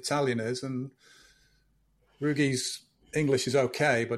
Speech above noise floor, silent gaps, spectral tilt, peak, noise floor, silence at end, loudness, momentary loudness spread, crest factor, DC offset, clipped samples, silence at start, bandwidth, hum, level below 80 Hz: 40 dB; none; -4.5 dB/octave; -12 dBFS; -69 dBFS; 0 s; -29 LUFS; 11 LU; 18 dB; under 0.1%; under 0.1%; 0 s; 14.5 kHz; none; -64 dBFS